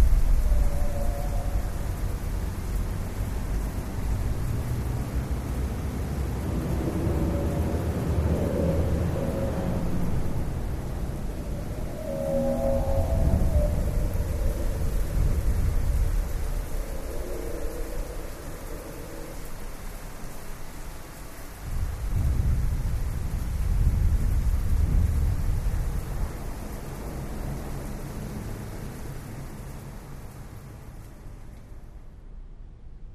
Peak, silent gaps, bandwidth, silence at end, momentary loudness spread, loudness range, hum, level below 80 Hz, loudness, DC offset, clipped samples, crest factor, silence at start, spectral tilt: -8 dBFS; none; 15.5 kHz; 0 s; 16 LU; 12 LU; none; -28 dBFS; -30 LUFS; under 0.1%; under 0.1%; 18 dB; 0 s; -7 dB/octave